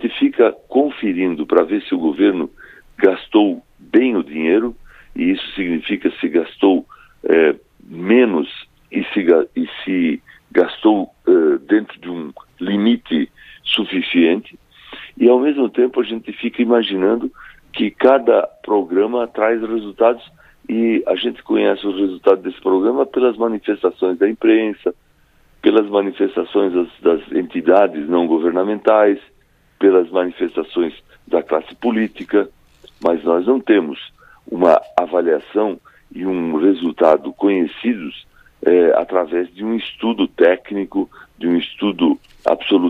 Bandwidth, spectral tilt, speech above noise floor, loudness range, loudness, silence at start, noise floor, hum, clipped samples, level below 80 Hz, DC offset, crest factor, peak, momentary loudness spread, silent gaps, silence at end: 4.9 kHz; -7.5 dB/octave; 37 dB; 2 LU; -17 LUFS; 0 s; -53 dBFS; none; under 0.1%; -54 dBFS; under 0.1%; 16 dB; 0 dBFS; 11 LU; none; 0 s